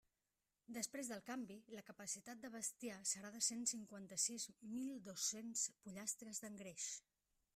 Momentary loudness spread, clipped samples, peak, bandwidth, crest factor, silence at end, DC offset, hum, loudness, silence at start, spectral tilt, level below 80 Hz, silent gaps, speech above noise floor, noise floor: 12 LU; under 0.1%; -26 dBFS; 16 kHz; 24 dB; 0.55 s; under 0.1%; none; -46 LUFS; 0.7 s; -1.5 dB/octave; -88 dBFS; none; over 42 dB; under -90 dBFS